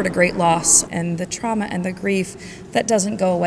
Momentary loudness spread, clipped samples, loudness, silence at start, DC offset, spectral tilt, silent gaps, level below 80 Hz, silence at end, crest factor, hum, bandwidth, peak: 11 LU; under 0.1%; -19 LUFS; 0 s; under 0.1%; -3.5 dB/octave; none; -48 dBFS; 0 s; 18 dB; none; 11 kHz; -2 dBFS